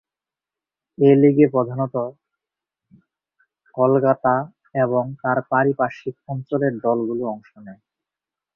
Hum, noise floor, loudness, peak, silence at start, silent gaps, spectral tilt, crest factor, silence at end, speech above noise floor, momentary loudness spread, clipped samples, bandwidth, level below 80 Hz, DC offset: none; -89 dBFS; -20 LUFS; -2 dBFS; 1 s; none; -10.5 dB/octave; 18 dB; 0.8 s; 70 dB; 15 LU; under 0.1%; 5.6 kHz; -64 dBFS; under 0.1%